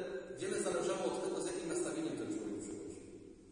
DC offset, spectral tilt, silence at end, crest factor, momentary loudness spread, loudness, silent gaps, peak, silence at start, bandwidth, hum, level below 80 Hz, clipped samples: under 0.1%; -4 dB/octave; 0 s; 16 dB; 13 LU; -40 LUFS; none; -24 dBFS; 0 s; 10.5 kHz; none; -68 dBFS; under 0.1%